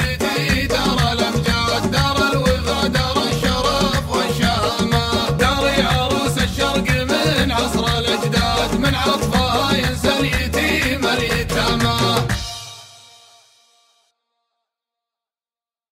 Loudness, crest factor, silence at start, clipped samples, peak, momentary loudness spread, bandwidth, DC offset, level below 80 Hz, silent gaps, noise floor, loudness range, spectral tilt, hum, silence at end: -17 LUFS; 16 dB; 0 s; under 0.1%; -2 dBFS; 2 LU; 16 kHz; under 0.1%; -30 dBFS; none; under -90 dBFS; 4 LU; -4.5 dB/octave; none; 3.05 s